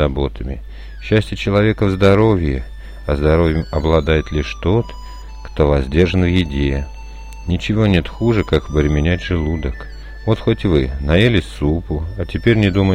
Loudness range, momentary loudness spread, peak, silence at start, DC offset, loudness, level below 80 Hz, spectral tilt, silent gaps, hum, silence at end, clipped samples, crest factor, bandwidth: 2 LU; 17 LU; -2 dBFS; 0 s; under 0.1%; -17 LUFS; -26 dBFS; -7.5 dB/octave; none; none; 0 s; under 0.1%; 14 dB; 10 kHz